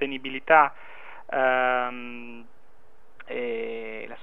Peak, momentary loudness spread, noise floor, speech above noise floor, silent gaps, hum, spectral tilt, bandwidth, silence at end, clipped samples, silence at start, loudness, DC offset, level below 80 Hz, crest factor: -4 dBFS; 25 LU; -60 dBFS; 35 dB; none; none; -6 dB/octave; 4 kHz; 0.05 s; under 0.1%; 0 s; -24 LUFS; 1%; -66 dBFS; 24 dB